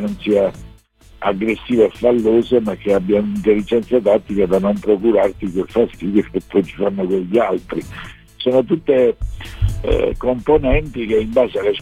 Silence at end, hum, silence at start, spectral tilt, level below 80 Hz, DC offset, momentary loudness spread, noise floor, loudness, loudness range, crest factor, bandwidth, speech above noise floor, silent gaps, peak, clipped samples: 0 s; none; 0 s; -7.5 dB/octave; -32 dBFS; 0.1%; 8 LU; -45 dBFS; -17 LUFS; 3 LU; 14 dB; 13.5 kHz; 29 dB; none; -2 dBFS; under 0.1%